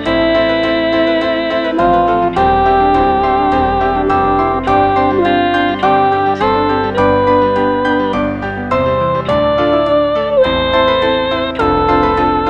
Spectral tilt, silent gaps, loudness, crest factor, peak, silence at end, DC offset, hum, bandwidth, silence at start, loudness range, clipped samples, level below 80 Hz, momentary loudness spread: -7 dB/octave; none; -13 LUFS; 12 dB; 0 dBFS; 0 s; 0.3%; none; 8.8 kHz; 0 s; 1 LU; under 0.1%; -32 dBFS; 3 LU